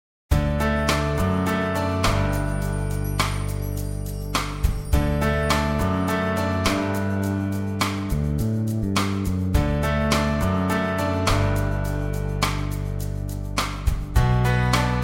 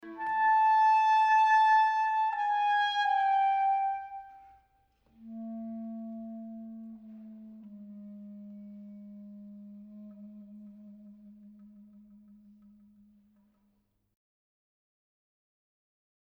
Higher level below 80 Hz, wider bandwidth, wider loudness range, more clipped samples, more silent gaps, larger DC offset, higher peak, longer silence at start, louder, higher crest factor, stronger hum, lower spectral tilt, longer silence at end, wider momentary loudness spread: first, -28 dBFS vs -76 dBFS; first, 17 kHz vs 6.4 kHz; second, 2 LU vs 25 LU; neither; neither; neither; first, -6 dBFS vs -16 dBFS; first, 0.3 s vs 0.05 s; about the same, -24 LUFS vs -26 LUFS; about the same, 16 dB vs 16 dB; neither; first, -5.5 dB/octave vs -3.5 dB/octave; second, 0 s vs 4.75 s; second, 6 LU vs 26 LU